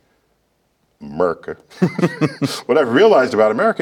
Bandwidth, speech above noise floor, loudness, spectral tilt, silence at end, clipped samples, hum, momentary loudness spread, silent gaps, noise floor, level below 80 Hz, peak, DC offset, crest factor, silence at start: 14.5 kHz; 49 dB; -16 LUFS; -6 dB/octave; 0.1 s; under 0.1%; none; 13 LU; none; -64 dBFS; -60 dBFS; -2 dBFS; under 0.1%; 16 dB; 1 s